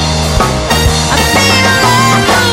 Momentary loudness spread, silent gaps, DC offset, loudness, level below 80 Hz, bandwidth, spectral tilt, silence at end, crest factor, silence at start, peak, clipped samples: 4 LU; none; under 0.1%; -8 LUFS; -20 dBFS; 16.5 kHz; -3.5 dB/octave; 0 s; 10 dB; 0 s; 0 dBFS; 0.2%